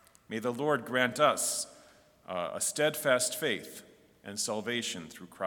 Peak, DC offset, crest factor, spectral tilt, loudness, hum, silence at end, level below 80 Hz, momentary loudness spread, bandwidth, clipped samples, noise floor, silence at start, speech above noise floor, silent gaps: -10 dBFS; under 0.1%; 22 dB; -2.5 dB/octave; -31 LUFS; none; 0 s; -76 dBFS; 15 LU; 18 kHz; under 0.1%; -59 dBFS; 0.3 s; 28 dB; none